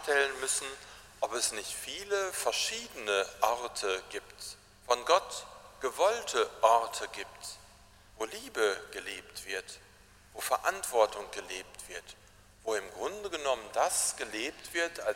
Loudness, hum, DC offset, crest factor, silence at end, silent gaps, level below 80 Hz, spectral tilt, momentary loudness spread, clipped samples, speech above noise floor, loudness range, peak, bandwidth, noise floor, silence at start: -32 LUFS; none; under 0.1%; 24 dB; 0 s; none; -64 dBFS; -0.5 dB/octave; 16 LU; under 0.1%; 25 dB; 4 LU; -10 dBFS; 16 kHz; -58 dBFS; 0 s